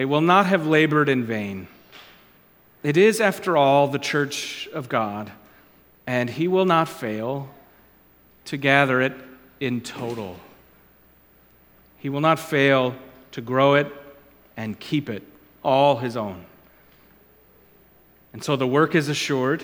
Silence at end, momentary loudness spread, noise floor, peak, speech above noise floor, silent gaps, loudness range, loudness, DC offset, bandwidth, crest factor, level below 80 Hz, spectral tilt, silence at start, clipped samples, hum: 0 s; 19 LU; -55 dBFS; 0 dBFS; 34 dB; none; 5 LU; -21 LUFS; under 0.1%; 19.5 kHz; 22 dB; -64 dBFS; -5.5 dB/octave; 0 s; under 0.1%; none